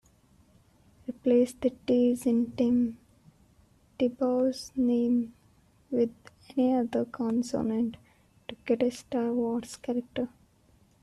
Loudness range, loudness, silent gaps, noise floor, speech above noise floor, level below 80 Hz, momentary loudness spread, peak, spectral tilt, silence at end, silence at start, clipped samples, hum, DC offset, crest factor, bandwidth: 3 LU; -29 LUFS; none; -63 dBFS; 36 dB; -64 dBFS; 10 LU; -14 dBFS; -6 dB/octave; 0.75 s; 1.1 s; under 0.1%; none; under 0.1%; 16 dB; 12.5 kHz